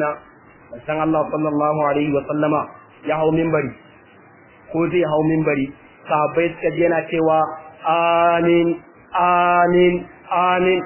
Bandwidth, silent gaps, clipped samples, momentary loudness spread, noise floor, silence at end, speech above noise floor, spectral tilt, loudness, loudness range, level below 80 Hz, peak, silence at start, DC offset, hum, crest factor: 3.2 kHz; none; under 0.1%; 12 LU; -47 dBFS; 0 s; 30 dB; -10.5 dB/octave; -19 LUFS; 4 LU; -52 dBFS; -4 dBFS; 0 s; under 0.1%; none; 14 dB